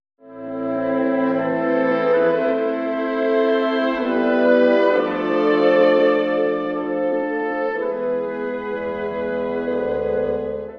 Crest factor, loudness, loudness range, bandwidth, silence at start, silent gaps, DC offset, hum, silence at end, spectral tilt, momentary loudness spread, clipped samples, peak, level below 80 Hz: 16 dB; -20 LUFS; 6 LU; 5.8 kHz; 0.25 s; none; under 0.1%; none; 0 s; -7.5 dB/octave; 10 LU; under 0.1%; -4 dBFS; -54 dBFS